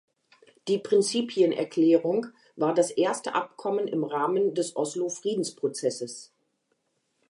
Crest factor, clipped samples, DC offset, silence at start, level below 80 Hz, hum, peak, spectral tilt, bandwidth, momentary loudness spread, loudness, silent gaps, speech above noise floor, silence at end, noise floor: 18 dB; under 0.1%; under 0.1%; 0.65 s; -84 dBFS; none; -10 dBFS; -4.5 dB/octave; 11.5 kHz; 7 LU; -26 LUFS; none; 49 dB; 1.05 s; -75 dBFS